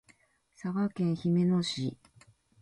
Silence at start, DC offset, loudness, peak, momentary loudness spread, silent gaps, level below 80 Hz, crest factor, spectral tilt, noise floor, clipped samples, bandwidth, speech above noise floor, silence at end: 0.65 s; under 0.1%; -31 LUFS; -20 dBFS; 10 LU; none; -68 dBFS; 12 dB; -7 dB/octave; -66 dBFS; under 0.1%; 11.5 kHz; 36 dB; 0.7 s